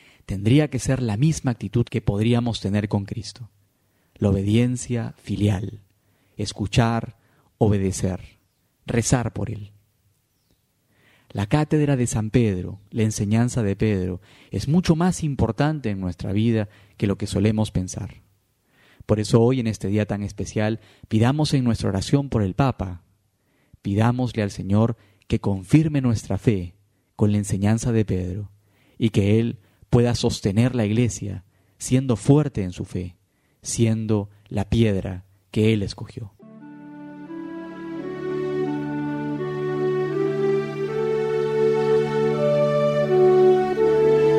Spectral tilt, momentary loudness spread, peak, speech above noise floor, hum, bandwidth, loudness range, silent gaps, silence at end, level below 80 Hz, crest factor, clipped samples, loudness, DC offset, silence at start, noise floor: -6.5 dB/octave; 15 LU; -2 dBFS; 45 dB; none; 13 kHz; 4 LU; none; 0 s; -44 dBFS; 20 dB; under 0.1%; -22 LUFS; under 0.1%; 0.3 s; -66 dBFS